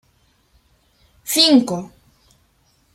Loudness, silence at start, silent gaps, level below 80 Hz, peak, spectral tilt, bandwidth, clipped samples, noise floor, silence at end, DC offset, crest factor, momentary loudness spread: -15 LUFS; 1.25 s; none; -62 dBFS; 0 dBFS; -3 dB/octave; 16.5 kHz; under 0.1%; -60 dBFS; 1.1 s; under 0.1%; 22 dB; 24 LU